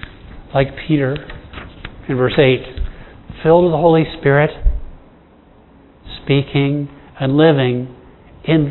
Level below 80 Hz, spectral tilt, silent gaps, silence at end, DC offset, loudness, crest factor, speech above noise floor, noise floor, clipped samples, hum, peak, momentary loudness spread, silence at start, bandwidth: -30 dBFS; -11 dB/octave; none; 0 s; under 0.1%; -16 LUFS; 16 dB; 32 dB; -46 dBFS; under 0.1%; none; 0 dBFS; 20 LU; 0.05 s; 4.2 kHz